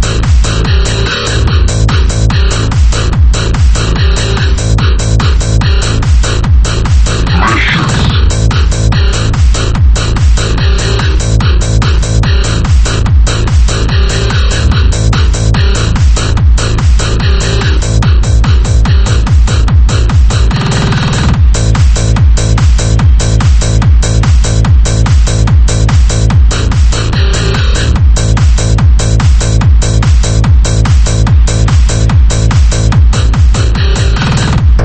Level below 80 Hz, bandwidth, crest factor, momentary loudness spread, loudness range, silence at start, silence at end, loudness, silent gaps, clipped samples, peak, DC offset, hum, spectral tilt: -8 dBFS; 8.8 kHz; 6 dB; 2 LU; 1 LU; 0 s; 0 s; -9 LUFS; none; 0.9%; 0 dBFS; under 0.1%; none; -5 dB/octave